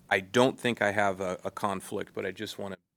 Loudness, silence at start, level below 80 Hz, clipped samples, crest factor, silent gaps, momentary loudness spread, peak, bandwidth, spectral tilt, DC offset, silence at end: -30 LUFS; 0.1 s; -70 dBFS; under 0.1%; 22 dB; none; 12 LU; -8 dBFS; over 20 kHz; -4.5 dB/octave; under 0.1%; 0.2 s